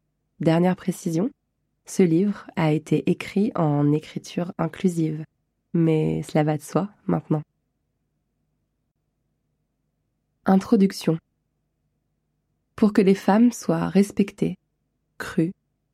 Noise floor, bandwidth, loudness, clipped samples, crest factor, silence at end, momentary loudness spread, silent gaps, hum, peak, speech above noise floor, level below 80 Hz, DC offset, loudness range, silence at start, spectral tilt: -75 dBFS; 14 kHz; -23 LUFS; under 0.1%; 18 dB; 0.4 s; 10 LU; none; none; -6 dBFS; 53 dB; -60 dBFS; under 0.1%; 6 LU; 0.4 s; -7.5 dB/octave